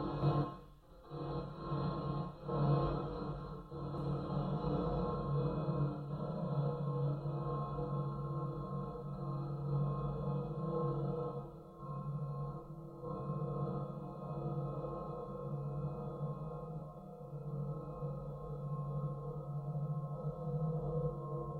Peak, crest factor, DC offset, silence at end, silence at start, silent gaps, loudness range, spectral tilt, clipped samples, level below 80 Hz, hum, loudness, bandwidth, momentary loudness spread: -22 dBFS; 18 dB; under 0.1%; 0 s; 0 s; none; 6 LU; -10.5 dB/octave; under 0.1%; -54 dBFS; none; -40 LUFS; 4.5 kHz; 9 LU